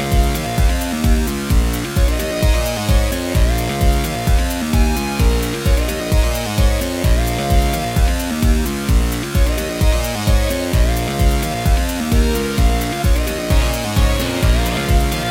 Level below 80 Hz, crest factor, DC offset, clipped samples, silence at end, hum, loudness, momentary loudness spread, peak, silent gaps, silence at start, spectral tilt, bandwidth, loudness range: -18 dBFS; 14 dB; under 0.1%; under 0.1%; 0 s; none; -17 LUFS; 2 LU; -2 dBFS; none; 0 s; -5 dB/octave; 16.5 kHz; 0 LU